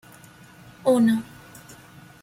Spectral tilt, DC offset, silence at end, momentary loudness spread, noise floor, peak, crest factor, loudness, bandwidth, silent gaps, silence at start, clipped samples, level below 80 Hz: -6 dB/octave; under 0.1%; 1 s; 25 LU; -48 dBFS; -10 dBFS; 16 dB; -22 LUFS; 16 kHz; none; 0.85 s; under 0.1%; -64 dBFS